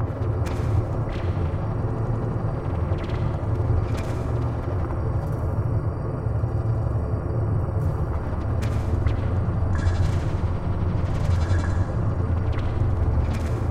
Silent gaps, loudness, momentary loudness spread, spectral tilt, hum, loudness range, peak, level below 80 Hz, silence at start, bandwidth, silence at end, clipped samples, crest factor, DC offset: none; -25 LUFS; 3 LU; -8.5 dB/octave; none; 2 LU; -10 dBFS; -30 dBFS; 0 s; 9.4 kHz; 0 s; under 0.1%; 14 dB; under 0.1%